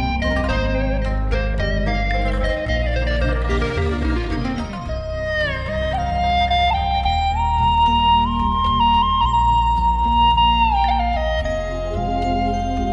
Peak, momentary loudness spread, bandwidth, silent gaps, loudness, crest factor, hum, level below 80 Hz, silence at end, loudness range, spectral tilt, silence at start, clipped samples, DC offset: -6 dBFS; 8 LU; 8 kHz; none; -19 LUFS; 14 dB; none; -24 dBFS; 0 s; 6 LU; -6.5 dB/octave; 0 s; under 0.1%; under 0.1%